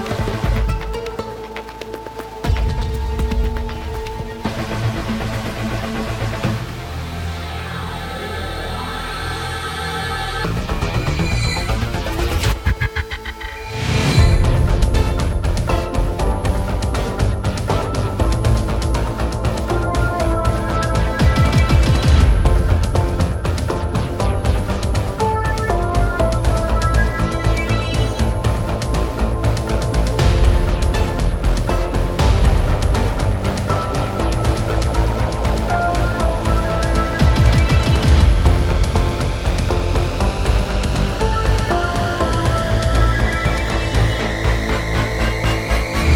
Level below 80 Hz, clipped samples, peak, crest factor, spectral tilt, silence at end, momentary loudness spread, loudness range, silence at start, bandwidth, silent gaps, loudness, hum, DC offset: -20 dBFS; under 0.1%; -2 dBFS; 16 dB; -6 dB/octave; 0 s; 10 LU; 7 LU; 0 s; 16 kHz; none; -19 LUFS; none; under 0.1%